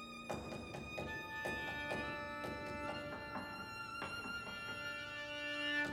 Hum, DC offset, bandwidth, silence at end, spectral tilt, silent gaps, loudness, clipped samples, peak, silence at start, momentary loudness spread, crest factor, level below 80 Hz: none; under 0.1%; over 20 kHz; 0 s; -4 dB/octave; none; -43 LUFS; under 0.1%; -28 dBFS; 0 s; 5 LU; 18 dB; -64 dBFS